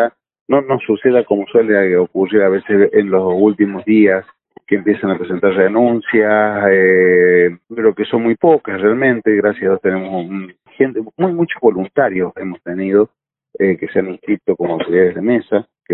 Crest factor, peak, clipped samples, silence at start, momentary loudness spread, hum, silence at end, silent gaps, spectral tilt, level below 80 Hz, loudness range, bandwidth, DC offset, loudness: 14 dB; 0 dBFS; under 0.1%; 0 s; 8 LU; none; 0 s; 0.41-0.46 s; -11.5 dB/octave; -56 dBFS; 5 LU; 4.1 kHz; under 0.1%; -14 LUFS